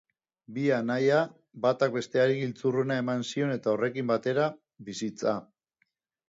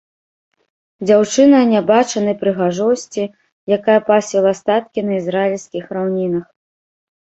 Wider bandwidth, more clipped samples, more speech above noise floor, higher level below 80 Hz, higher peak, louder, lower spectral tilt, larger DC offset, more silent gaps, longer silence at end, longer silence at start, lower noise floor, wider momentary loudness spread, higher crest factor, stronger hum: about the same, 7.8 kHz vs 8.2 kHz; neither; second, 49 dB vs over 75 dB; second, -74 dBFS vs -60 dBFS; second, -12 dBFS vs -2 dBFS; second, -28 LUFS vs -16 LUFS; about the same, -6 dB/octave vs -5.5 dB/octave; neither; second, none vs 3.52-3.67 s; about the same, 0.85 s vs 0.95 s; second, 0.5 s vs 1 s; second, -76 dBFS vs under -90 dBFS; second, 10 LU vs 13 LU; about the same, 18 dB vs 16 dB; neither